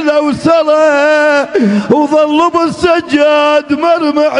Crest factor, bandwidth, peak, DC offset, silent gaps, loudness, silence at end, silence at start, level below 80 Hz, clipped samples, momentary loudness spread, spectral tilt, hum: 10 dB; 10.5 kHz; 0 dBFS; under 0.1%; none; -10 LUFS; 0 s; 0 s; -46 dBFS; under 0.1%; 3 LU; -5.5 dB/octave; none